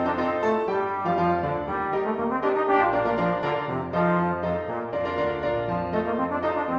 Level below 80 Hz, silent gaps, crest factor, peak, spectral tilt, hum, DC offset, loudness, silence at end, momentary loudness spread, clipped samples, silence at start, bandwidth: -52 dBFS; none; 16 dB; -10 dBFS; -8 dB/octave; none; under 0.1%; -25 LUFS; 0 s; 5 LU; under 0.1%; 0 s; 6.8 kHz